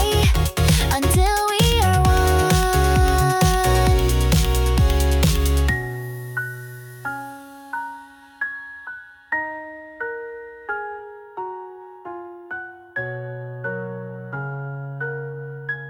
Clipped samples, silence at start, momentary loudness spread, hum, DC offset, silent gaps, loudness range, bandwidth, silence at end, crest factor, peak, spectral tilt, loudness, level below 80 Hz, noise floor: under 0.1%; 0 s; 18 LU; none; under 0.1%; none; 14 LU; 19 kHz; 0 s; 16 dB; -6 dBFS; -5 dB/octave; -21 LUFS; -26 dBFS; -41 dBFS